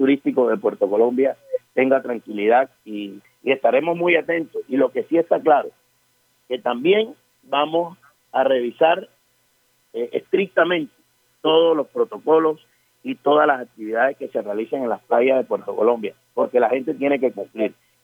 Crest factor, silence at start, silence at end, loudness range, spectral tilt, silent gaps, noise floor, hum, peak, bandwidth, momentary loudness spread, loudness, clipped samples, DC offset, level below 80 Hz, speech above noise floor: 18 dB; 0 s; 0.3 s; 2 LU; -6.5 dB/octave; none; -63 dBFS; none; -2 dBFS; 4.2 kHz; 11 LU; -20 LUFS; under 0.1%; under 0.1%; -80 dBFS; 44 dB